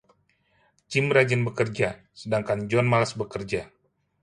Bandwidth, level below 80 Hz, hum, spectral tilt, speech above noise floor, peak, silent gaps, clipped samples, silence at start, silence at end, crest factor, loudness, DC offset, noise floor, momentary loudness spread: 11 kHz; -58 dBFS; none; -6 dB/octave; 42 dB; -6 dBFS; none; under 0.1%; 0.9 s; 0.55 s; 20 dB; -25 LUFS; under 0.1%; -67 dBFS; 11 LU